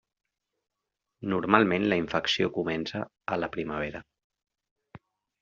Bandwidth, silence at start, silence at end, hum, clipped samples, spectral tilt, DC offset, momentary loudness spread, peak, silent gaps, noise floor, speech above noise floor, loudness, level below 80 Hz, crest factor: 7.4 kHz; 1.2 s; 0.45 s; none; under 0.1%; -3.5 dB/octave; under 0.1%; 13 LU; -4 dBFS; 4.24-4.30 s, 4.71-4.76 s; -85 dBFS; 58 dB; -28 LUFS; -60 dBFS; 28 dB